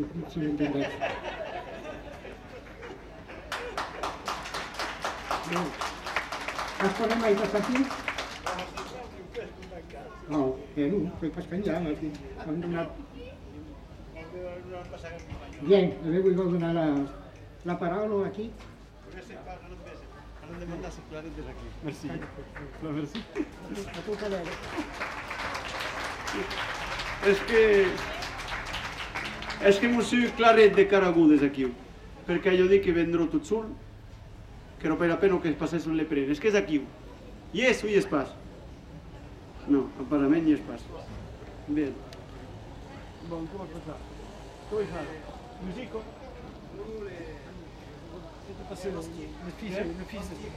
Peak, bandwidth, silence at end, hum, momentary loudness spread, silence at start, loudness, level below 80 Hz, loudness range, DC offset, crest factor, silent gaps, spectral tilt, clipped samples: -6 dBFS; 14 kHz; 0 s; none; 22 LU; 0 s; -28 LUFS; -50 dBFS; 15 LU; under 0.1%; 22 dB; none; -5.5 dB/octave; under 0.1%